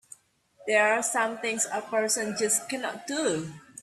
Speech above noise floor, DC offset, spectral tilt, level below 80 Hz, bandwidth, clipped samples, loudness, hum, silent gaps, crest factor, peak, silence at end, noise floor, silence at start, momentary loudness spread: 31 dB; under 0.1%; -2 dB/octave; -74 dBFS; 14 kHz; under 0.1%; -27 LUFS; none; none; 18 dB; -10 dBFS; 0 s; -59 dBFS; 0.6 s; 10 LU